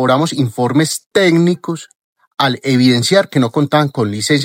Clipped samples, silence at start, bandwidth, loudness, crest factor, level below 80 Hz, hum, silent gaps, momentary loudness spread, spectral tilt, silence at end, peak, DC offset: under 0.1%; 0 s; 16.5 kHz; -14 LUFS; 14 dB; -62 dBFS; none; 1.06-1.11 s, 1.95-2.16 s; 7 LU; -5 dB/octave; 0 s; 0 dBFS; under 0.1%